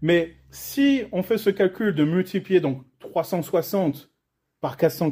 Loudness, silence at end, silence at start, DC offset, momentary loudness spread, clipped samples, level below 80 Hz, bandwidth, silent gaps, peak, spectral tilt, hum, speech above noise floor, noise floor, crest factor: -23 LUFS; 0 s; 0 s; under 0.1%; 12 LU; under 0.1%; -60 dBFS; 16 kHz; none; -6 dBFS; -6.5 dB/octave; none; 55 dB; -77 dBFS; 16 dB